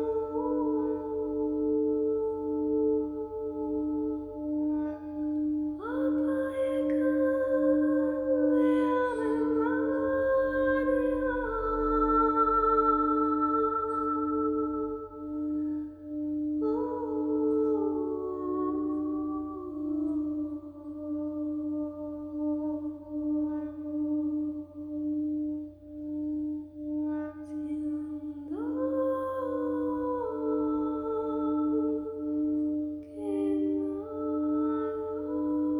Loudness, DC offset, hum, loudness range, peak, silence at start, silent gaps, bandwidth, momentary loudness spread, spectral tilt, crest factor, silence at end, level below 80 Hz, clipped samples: -30 LUFS; under 0.1%; none; 8 LU; -14 dBFS; 0 s; none; 3.9 kHz; 10 LU; -8.5 dB/octave; 16 dB; 0 s; -54 dBFS; under 0.1%